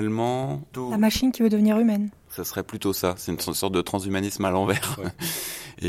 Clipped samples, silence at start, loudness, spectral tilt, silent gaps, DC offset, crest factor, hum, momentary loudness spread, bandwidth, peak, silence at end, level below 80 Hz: under 0.1%; 0 s; -25 LUFS; -5 dB/octave; none; under 0.1%; 16 dB; none; 11 LU; 16.5 kHz; -8 dBFS; 0 s; -50 dBFS